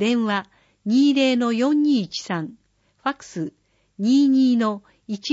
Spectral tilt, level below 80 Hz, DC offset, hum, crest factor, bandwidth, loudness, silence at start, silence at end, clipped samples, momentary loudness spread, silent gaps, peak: -5 dB/octave; -70 dBFS; under 0.1%; none; 12 dB; 8 kHz; -21 LUFS; 0 s; 0 s; under 0.1%; 16 LU; none; -8 dBFS